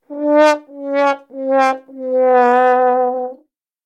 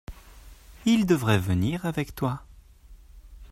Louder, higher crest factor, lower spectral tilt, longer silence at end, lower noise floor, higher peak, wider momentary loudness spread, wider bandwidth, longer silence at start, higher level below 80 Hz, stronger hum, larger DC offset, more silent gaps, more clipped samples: first, -15 LUFS vs -25 LUFS; second, 14 dB vs 20 dB; second, -3 dB/octave vs -6.5 dB/octave; first, 0.5 s vs 0.05 s; first, -54 dBFS vs -50 dBFS; first, 0 dBFS vs -8 dBFS; about the same, 11 LU vs 10 LU; second, 9.8 kHz vs 16 kHz; about the same, 0.1 s vs 0.1 s; second, -90 dBFS vs -48 dBFS; neither; neither; neither; neither